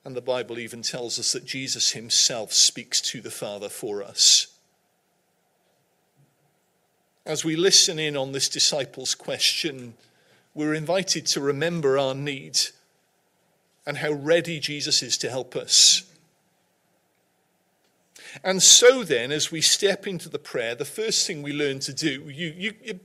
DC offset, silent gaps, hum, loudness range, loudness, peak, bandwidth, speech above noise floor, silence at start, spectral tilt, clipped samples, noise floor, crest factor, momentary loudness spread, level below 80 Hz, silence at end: under 0.1%; none; none; 7 LU; -21 LUFS; -2 dBFS; 16 kHz; 46 dB; 0.05 s; -1.5 dB/octave; under 0.1%; -69 dBFS; 22 dB; 16 LU; -74 dBFS; 0.05 s